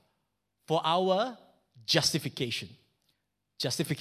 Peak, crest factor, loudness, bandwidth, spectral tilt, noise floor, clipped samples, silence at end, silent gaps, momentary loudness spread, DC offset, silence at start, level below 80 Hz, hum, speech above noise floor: -8 dBFS; 24 dB; -29 LUFS; 16 kHz; -3.5 dB/octave; -80 dBFS; under 0.1%; 0 s; none; 10 LU; under 0.1%; 0.7 s; -68 dBFS; none; 51 dB